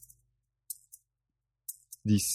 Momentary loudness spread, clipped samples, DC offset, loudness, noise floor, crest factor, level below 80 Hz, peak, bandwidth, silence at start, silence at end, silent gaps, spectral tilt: 27 LU; under 0.1%; under 0.1%; -36 LUFS; -86 dBFS; 22 dB; -66 dBFS; -14 dBFS; 17 kHz; 0.7 s; 0 s; none; -4.5 dB/octave